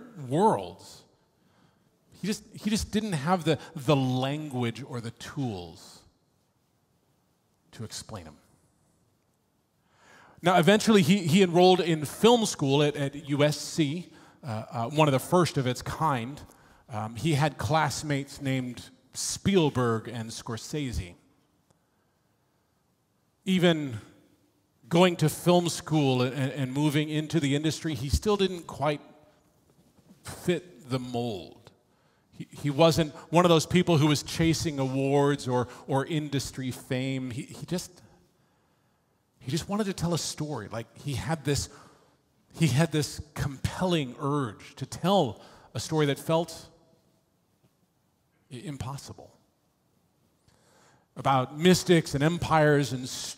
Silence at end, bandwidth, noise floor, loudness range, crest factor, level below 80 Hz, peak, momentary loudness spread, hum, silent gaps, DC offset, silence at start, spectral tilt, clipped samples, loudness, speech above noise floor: 0.05 s; 16 kHz; -71 dBFS; 15 LU; 22 dB; -52 dBFS; -6 dBFS; 17 LU; none; none; under 0.1%; 0 s; -5.5 dB/octave; under 0.1%; -27 LUFS; 44 dB